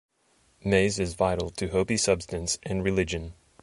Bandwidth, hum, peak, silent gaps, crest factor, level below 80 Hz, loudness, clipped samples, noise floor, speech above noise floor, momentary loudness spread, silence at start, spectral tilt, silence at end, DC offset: 11.5 kHz; none; -8 dBFS; none; 20 dB; -44 dBFS; -27 LUFS; under 0.1%; -66 dBFS; 39 dB; 8 LU; 0.65 s; -4.5 dB/octave; 0.3 s; under 0.1%